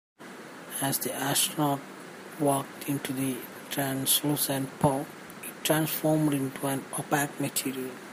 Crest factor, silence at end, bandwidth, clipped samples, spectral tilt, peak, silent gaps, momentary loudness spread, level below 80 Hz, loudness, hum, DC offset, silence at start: 20 dB; 0 s; 15.5 kHz; under 0.1%; -4 dB/octave; -10 dBFS; none; 16 LU; -68 dBFS; -28 LUFS; none; under 0.1%; 0.2 s